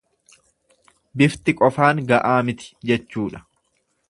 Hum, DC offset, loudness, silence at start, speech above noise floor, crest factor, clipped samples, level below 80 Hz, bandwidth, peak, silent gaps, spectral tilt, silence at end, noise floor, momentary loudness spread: none; under 0.1%; -20 LUFS; 1.15 s; 50 dB; 22 dB; under 0.1%; -56 dBFS; 11.5 kHz; 0 dBFS; none; -6.5 dB/octave; 0.7 s; -69 dBFS; 13 LU